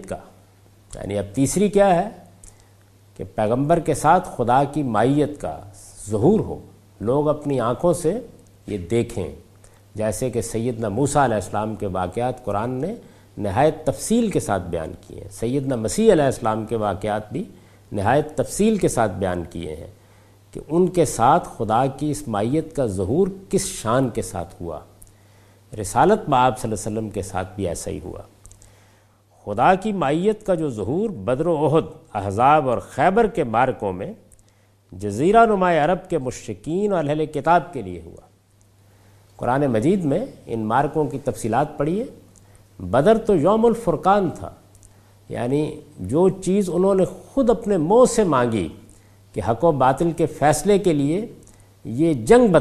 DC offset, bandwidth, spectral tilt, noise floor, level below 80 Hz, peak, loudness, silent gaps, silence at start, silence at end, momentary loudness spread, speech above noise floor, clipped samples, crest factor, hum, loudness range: under 0.1%; 14.5 kHz; -6 dB/octave; -56 dBFS; -44 dBFS; 0 dBFS; -21 LUFS; none; 0 s; 0 s; 15 LU; 36 dB; under 0.1%; 20 dB; none; 4 LU